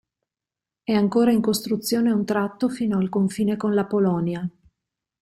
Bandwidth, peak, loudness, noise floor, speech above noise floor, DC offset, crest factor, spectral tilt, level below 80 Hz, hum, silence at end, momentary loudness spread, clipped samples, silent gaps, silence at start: 15.5 kHz; -8 dBFS; -22 LUFS; -89 dBFS; 68 dB; under 0.1%; 14 dB; -6 dB/octave; -60 dBFS; none; 0.75 s; 7 LU; under 0.1%; none; 0.9 s